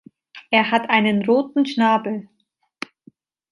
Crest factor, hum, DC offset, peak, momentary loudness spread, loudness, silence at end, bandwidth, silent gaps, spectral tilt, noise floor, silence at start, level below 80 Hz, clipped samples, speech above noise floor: 20 dB; none; under 0.1%; -2 dBFS; 18 LU; -19 LUFS; 1.3 s; 11 kHz; none; -6 dB/octave; -54 dBFS; 0.35 s; -68 dBFS; under 0.1%; 35 dB